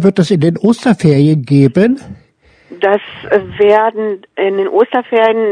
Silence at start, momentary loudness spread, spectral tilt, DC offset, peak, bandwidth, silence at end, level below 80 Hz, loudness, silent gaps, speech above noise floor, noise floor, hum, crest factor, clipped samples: 0 s; 7 LU; -7.5 dB/octave; under 0.1%; 0 dBFS; 10 kHz; 0 s; -50 dBFS; -12 LUFS; none; 36 dB; -47 dBFS; none; 12 dB; 0.4%